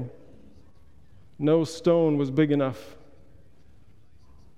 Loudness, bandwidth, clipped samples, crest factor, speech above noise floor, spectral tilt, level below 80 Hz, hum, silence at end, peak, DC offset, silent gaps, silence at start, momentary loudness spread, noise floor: -24 LUFS; 12 kHz; under 0.1%; 18 dB; 34 dB; -7.5 dB/octave; -60 dBFS; none; 1.7 s; -10 dBFS; 0.4%; none; 0 s; 11 LU; -57 dBFS